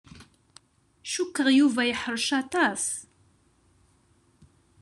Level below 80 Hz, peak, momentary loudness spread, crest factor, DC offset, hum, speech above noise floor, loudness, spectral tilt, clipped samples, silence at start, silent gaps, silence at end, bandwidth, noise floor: -66 dBFS; -10 dBFS; 12 LU; 18 dB; under 0.1%; none; 39 dB; -25 LUFS; -2 dB/octave; under 0.1%; 0.15 s; none; 1.8 s; 12.5 kHz; -64 dBFS